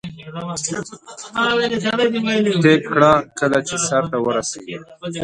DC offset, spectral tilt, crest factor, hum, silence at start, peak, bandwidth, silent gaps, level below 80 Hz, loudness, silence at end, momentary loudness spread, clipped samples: under 0.1%; -4 dB/octave; 18 dB; none; 0.05 s; 0 dBFS; 11.5 kHz; none; -54 dBFS; -18 LUFS; 0 s; 17 LU; under 0.1%